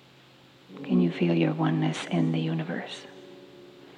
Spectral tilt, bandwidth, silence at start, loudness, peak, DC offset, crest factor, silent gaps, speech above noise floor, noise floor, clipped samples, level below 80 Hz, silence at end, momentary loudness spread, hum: -7 dB/octave; 10 kHz; 0.7 s; -27 LUFS; -12 dBFS; under 0.1%; 16 dB; none; 28 dB; -55 dBFS; under 0.1%; -78 dBFS; 0.05 s; 23 LU; none